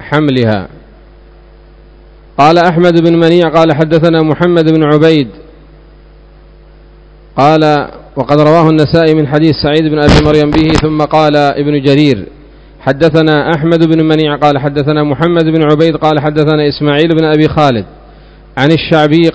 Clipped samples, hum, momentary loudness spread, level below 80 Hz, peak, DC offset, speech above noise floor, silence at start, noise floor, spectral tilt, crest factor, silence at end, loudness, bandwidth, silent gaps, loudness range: 2%; none; 6 LU; -30 dBFS; 0 dBFS; under 0.1%; 29 dB; 0 s; -37 dBFS; -7.5 dB/octave; 10 dB; 0 s; -9 LUFS; 8 kHz; none; 4 LU